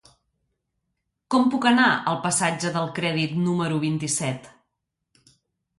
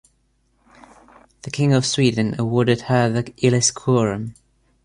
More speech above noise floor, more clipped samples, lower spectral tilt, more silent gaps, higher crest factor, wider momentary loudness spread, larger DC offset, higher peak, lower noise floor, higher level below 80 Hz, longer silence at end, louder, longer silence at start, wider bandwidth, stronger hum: first, 57 dB vs 45 dB; neither; about the same, -4 dB/octave vs -5 dB/octave; neither; about the same, 18 dB vs 18 dB; second, 8 LU vs 12 LU; neither; second, -6 dBFS vs -2 dBFS; first, -80 dBFS vs -64 dBFS; second, -66 dBFS vs -52 dBFS; first, 1.3 s vs 0.5 s; second, -23 LUFS vs -19 LUFS; second, 1.3 s vs 1.45 s; about the same, 11.5 kHz vs 11 kHz; neither